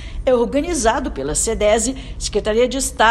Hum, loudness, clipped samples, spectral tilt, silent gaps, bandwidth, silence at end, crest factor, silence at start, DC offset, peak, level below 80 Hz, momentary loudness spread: none; -18 LUFS; under 0.1%; -3 dB/octave; none; 16 kHz; 0 s; 18 dB; 0 s; under 0.1%; 0 dBFS; -30 dBFS; 6 LU